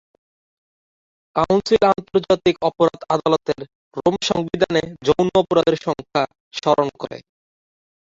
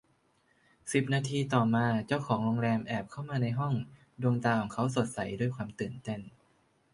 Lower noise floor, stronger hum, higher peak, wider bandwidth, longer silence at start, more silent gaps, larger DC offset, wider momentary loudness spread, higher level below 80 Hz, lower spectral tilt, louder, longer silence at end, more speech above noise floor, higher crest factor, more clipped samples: first, under -90 dBFS vs -70 dBFS; neither; first, -2 dBFS vs -12 dBFS; second, 7.8 kHz vs 11.5 kHz; first, 1.35 s vs 0.85 s; first, 3.75-3.91 s, 6.40-6.51 s vs none; neither; about the same, 10 LU vs 10 LU; first, -50 dBFS vs -64 dBFS; about the same, -5.5 dB/octave vs -6.5 dB/octave; first, -19 LUFS vs -32 LUFS; first, 1 s vs 0.65 s; first, over 71 dB vs 39 dB; about the same, 18 dB vs 20 dB; neither